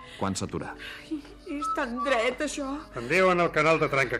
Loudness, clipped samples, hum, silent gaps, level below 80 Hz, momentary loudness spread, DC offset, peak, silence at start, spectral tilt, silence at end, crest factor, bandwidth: -26 LUFS; under 0.1%; none; none; -52 dBFS; 15 LU; under 0.1%; -10 dBFS; 0 s; -4.5 dB/octave; 0 s; 16 dB; 15 kHz